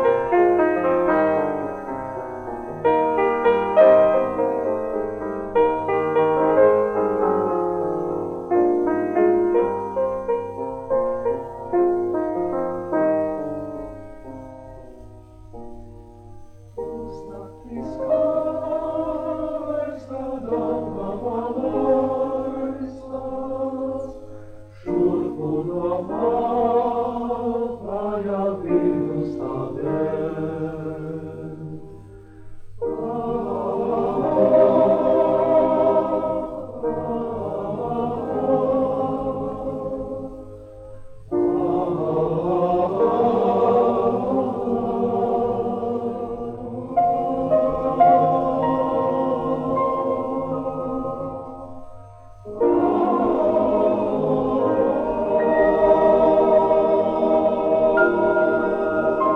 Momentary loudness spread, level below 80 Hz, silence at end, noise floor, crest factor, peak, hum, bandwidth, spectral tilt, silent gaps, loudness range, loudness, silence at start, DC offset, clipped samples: 15 LU; -48 dBFS; 0 s; -42 dBFS; 18 dB; -4 dBFS; none; 6.4 kHz; -9 dB/octave; none; 9 LU; -21 LUFS; 0 s; under 0.1%; under 0.1%